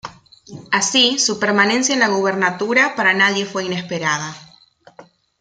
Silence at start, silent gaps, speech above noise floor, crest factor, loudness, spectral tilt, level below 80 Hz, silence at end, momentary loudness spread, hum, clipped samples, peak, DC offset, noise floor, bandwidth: 0.05 s; none; 32 dB; 18 dB; -16 LUFS; -2 dB/octave; -62 dBFS; 0.4 s; 10 LU; none; under 0.1%; -2 dBFS; under 0.1%; -50 dBFS; 10 kHz